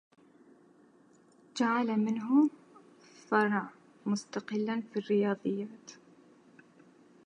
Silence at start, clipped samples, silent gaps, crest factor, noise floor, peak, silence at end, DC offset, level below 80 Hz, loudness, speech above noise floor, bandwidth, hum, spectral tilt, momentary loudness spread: 1.55 s; under 0.1%; none; 20 dB; -62 dBFS; -12 dBFS; 1.35 s; under 0.1%; -88 dBFS; -31 LUFS; 32 dB; 10 kHz; none; -6 dB/octave; 16 LU